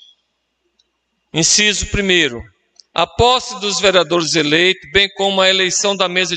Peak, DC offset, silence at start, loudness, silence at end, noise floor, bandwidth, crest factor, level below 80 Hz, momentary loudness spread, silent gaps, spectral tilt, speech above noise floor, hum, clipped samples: 0 dBFS; under 0.1%; 1.35 s; -14 LUFS; 0 s; -69 dBFS; 9.4 kHz; 16 dB; -38 dBFS; 7 LU; none; -2 dB/octave; 54 dB; none; under 0.1%